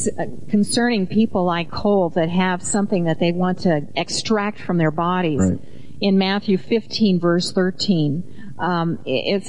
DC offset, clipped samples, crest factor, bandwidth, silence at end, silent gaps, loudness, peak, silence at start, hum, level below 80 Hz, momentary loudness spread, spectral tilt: 3%; under 0.1%; 12 dB; 11 kHz; 0 s; none; -20 LUFS; -8 dBFS; 0 s; none; -52 dBFS; 5 LU; -5.5 dB/octave